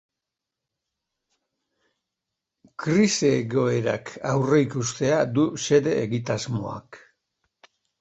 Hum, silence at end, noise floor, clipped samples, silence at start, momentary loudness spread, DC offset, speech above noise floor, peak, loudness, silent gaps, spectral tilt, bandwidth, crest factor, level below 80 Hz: none; 1.05 s; -86 dBFS; under 0.1%; 2.8 s; 10 LU; under 0.1%; 63 dB; -6 dBFS; -23 LUFS; none; -5.5 dB/octave; 8.2 kHz; 18 dB; -60 dBFS